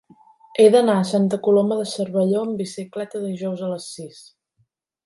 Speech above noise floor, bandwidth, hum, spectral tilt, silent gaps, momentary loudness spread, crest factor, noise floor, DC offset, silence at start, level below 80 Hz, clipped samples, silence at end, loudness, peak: 48 dB; 11.5 kHz; none; -6 dB/octave; none; 16 LU; 18 dB; -68 dBFS; under 0.1%; 0.55 s; -72 dBFS; under 0.1%; 0.85 s; -20 LUFS; -4 dBFS